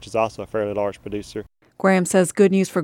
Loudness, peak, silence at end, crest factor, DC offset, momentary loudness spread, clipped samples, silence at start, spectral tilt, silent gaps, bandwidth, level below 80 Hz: -20 LUFS; -4 dBFS; 0 s; 16 dB; under 0.1%; 14 LU; under 0.1%; 0 s; -5.5 dB/octave; none; 14.5 kHz; -54 dBFS